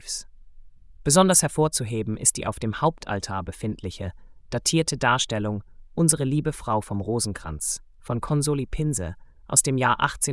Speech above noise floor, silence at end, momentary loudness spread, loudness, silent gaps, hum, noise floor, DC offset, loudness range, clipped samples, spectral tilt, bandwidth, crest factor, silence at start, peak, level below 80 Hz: 21 dB; 0 s; 14 LU; -24 LUFS; none; none; -45 dBFS; under 0.1%; 4 LU; under 0.1%; -4 dB/octave; 12 kHz; 22 dB; 0.05 s; -4 dBFS; -44 dBFS